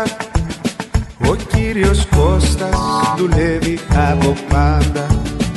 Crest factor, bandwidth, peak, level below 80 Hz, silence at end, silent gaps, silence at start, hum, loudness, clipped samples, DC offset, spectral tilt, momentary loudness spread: 12 dB; 12.5 kHz; -2 dBFS; -20 dBFS; 0 s; none; 0 s; none; -16 LUFS; under 0.1%; under 0.1%; -6 dB/octave; 7 LU